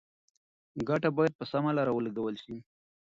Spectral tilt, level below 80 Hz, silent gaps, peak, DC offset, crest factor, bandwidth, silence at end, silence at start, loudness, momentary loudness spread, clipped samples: -8 dB/octave; -66 dBFS; 1.35-1.39 s; -14 dBFS; under 0.1%; 18 dB; 7.6 kHz; 0.45 s; 0.75 s; -31 LUFS; 17 LU; under 0.1%